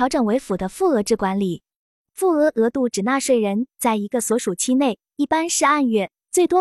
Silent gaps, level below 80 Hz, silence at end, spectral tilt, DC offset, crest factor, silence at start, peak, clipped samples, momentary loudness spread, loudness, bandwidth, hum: 1.76-2.05 s; -54 dBFS; 0 s; -4 dB/octave; under 0.1%; 14 dB; 0 s; -6 dBFS; under 0.1%; 6 LU; -20 LUFS; 13.5 kHz; none